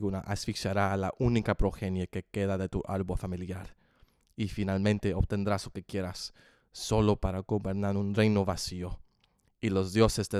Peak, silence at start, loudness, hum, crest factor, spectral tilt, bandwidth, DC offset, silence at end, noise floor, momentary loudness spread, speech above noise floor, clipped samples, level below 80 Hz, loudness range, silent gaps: -8 dBFS; 0 s; -31 LUFS; none; 22 dB; -6 dB/octave; 14.5 kHz; under 0.1%; 0 s; -70 dBFS; 13 LU; 41 dB; under 0.1%; -42 dBFS; 3 LU; none